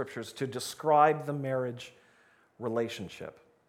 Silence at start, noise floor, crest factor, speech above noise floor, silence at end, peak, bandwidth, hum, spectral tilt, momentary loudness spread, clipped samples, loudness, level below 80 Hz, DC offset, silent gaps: 0 s; -64 dBFS; 22 dB; 34 dB; 0.35 s; -10 dBFS; 16.5 kHz; none; -5 dB/octave; 21 LU; under 0.1%; -30 LUFS; -74 dBFS; under 0.1%; none